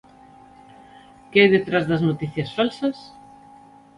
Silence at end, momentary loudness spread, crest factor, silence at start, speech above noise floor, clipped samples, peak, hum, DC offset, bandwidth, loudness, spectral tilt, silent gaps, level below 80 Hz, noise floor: 0.9 s; 12 LU; 22 dB; 1.3 s; 28 dB; under 0.1%; -2 dBFS; none; under 0.1%; 11 kHz; -20 LUFS; -7 dB/octave; none; -58 dBFS; -48 dBFS